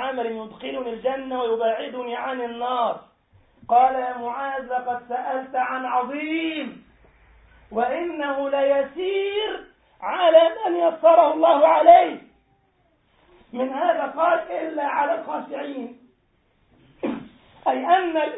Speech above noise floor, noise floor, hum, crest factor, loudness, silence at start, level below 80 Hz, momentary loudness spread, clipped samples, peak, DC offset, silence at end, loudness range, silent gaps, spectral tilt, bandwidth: 44 dB; -65 dBFS; none; 20 dB; -22 LUFS; 0 s; -64 dBFS; 16 LU; under 0.1%; -2 dBFS; under 0.1%; 0 s; 10 LU; none; -8.5 dB/octave; 4 kHz